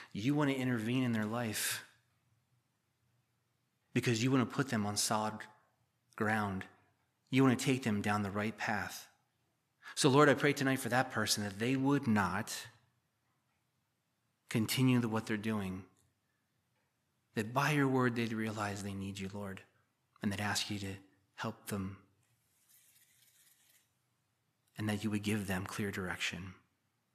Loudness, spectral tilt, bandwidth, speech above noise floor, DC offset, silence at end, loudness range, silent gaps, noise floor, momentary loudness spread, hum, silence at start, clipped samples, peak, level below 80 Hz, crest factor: -34 LUFS; -5 dB/octave; 15 kHz; 47 dB; under 0.1%; 0.6 s; 9 LU; none; -81 dBFS; 13 LU; none; 0 s; under 0.1%; -12 dBFS; -76 dBFS; 24 dB